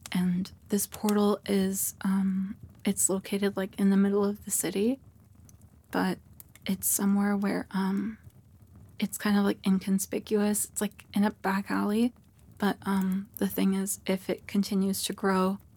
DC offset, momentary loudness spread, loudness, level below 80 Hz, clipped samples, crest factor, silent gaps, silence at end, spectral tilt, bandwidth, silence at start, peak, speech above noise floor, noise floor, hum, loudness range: under 0.1%; 7 LU; -29 LUFS; -64 dBFS; under 0.1%; 18 dB; none; 0.2 s; -5 dB/octave; 19 kHz; 0.05 s; -12 dBFS; 27 dB; -55 dBFS; none; 2 LU